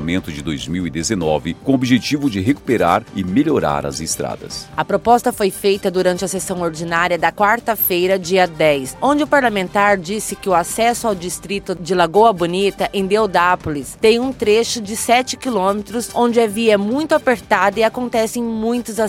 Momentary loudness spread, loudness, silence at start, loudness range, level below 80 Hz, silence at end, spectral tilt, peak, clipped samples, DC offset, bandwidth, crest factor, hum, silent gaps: 8 LU; -17 LUFS; 0 s; 2 LU; -44 dBFS; 0 s; -4.5 dB/octave; 0 dBFS; under 0.1%; under 0.1%; 16.5 kHz; 16 dB; none; none